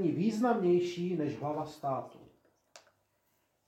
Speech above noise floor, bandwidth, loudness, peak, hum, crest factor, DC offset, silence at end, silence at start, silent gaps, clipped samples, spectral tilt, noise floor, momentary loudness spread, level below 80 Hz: 44 dB; 12 kHz; -32 LUFS; -16 dBFS; none; 18 dB; under 0.1%; 0.9 s; 0 s; none; under 0.1%; -7.5 dB/octave; -76 dBFS; 9 LU; -76 dBFS